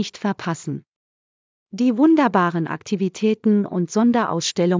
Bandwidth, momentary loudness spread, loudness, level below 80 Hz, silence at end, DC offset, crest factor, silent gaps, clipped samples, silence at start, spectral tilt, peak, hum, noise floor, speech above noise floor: 7.6 kHz; 12 LU; -20 LUFS; -68 dBFS; 0 s; under 0.1%; 16 dB; 0.88-1.66 s; under 0.1%; 0 s; -5.5 dB/octave; -4 dBFS; none; under -90 dBFS; over 71 dB